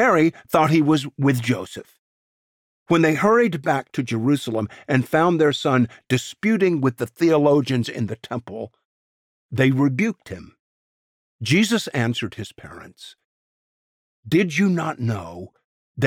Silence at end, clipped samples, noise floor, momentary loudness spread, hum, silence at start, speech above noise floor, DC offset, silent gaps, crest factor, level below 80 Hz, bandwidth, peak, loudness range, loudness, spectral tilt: 0 s; under 0.1%; under -90 dBFS; 18 LU; none; 0 s; over 70 dB; under 0.1%; 1.99-2.86 s, 8.85-9.49 s, 10.59-11.39 s, 13.24-14.23 s, 15.64-15.95 s; 18 dB; -60 dBFS; 17.5 kHz; -4 dBFS; 6 LU; -20 LUFS; -6 dB/octave